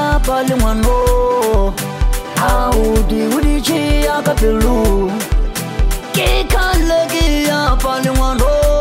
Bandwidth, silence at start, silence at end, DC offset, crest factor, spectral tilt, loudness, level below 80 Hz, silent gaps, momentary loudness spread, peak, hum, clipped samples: 16.5 kHz; 0 s; 0 s; under 0.1%; 12 dB; -5 dB/octave; -15 LUFS; -16 dBFS; none; 5 LU; 0 dBFS; none; under 0.1%